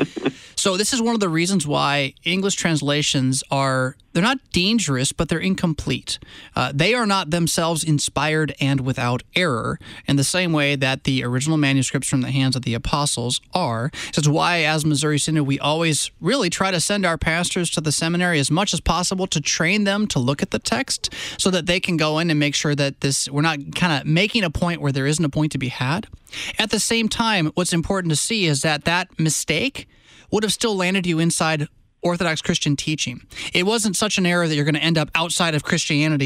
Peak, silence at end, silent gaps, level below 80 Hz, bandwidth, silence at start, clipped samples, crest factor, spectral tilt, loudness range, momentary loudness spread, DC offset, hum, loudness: -4 dBFS; 0 s; none; -44 dBFS; 15.5 kHz; 0 s; under 0.1%; 16 dB; -4 dB/octave; 2 LU; 5 LU; under 0.1%; none; -20 LUFS